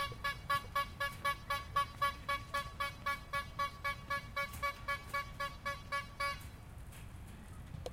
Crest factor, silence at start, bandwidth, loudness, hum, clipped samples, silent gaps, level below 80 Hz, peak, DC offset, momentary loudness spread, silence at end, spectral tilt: 18 dB; 0 s; 16 kHz; -39 LUFS; none; under 0.1%; none; -54 dBFS; -22 dBFS; under 0.1%; 15 LU; 0 s; -3.5 dB/octave